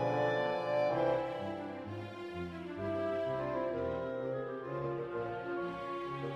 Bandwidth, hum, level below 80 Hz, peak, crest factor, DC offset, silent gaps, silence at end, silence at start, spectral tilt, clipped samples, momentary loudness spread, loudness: 10 kHz; none; -66 dBFS; -18 dBFS; 18 dB; under 0.1%; none; 0 s; 0 s; -7.5 dB/octave; under 0.1%; 10 LU; -37 LUFS